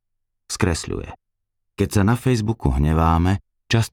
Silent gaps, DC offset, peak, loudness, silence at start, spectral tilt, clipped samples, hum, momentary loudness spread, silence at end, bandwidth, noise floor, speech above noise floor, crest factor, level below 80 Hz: none; under 0.1%; -6 dBFS; -21 LUFS; 0.5 s; -6 dB/octave; under 0.1%; none; 12 LU; 0.05 s; 16.5 kHz; -75 dBFS; 56 dB; 16 dB; -30 dBFS